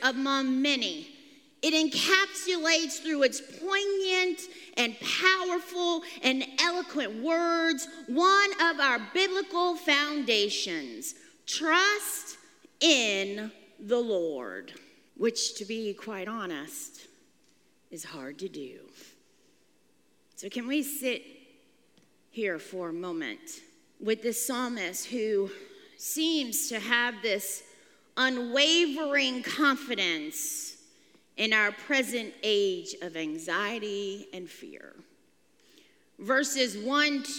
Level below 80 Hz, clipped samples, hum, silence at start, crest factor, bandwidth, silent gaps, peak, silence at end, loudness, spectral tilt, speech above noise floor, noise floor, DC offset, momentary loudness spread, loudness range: -88 dBFS; under 0.1%; none; 0 s; 26 dB; 17 kHz; none; -4 dBFS; 0 s; -28 LUFS; -1.5 dB/octave; 39 dB; -68 dBFS; under 0.1%; 17 LU; 11 LU